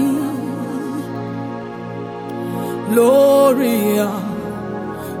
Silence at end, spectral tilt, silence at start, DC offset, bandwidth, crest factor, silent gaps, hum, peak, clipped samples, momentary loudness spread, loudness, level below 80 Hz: 0 s; -6 dB/octave; 0 s; under 0.1%; 18 kHz; 16 dB; none; none; -2 dBFS; under 0.1%; 16 LU; -18 LUFS; -54 dBFS